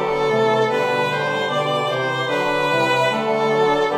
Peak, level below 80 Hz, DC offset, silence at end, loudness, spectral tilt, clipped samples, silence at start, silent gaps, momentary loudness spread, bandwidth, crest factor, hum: -6 dBFS; -54 dBFS; under 0.1%; 0 s; -19 LUFS; -5 dB/octave; under 0.1%; 0 s; none; 3 LU; 15.5 kHz; 12 dB; none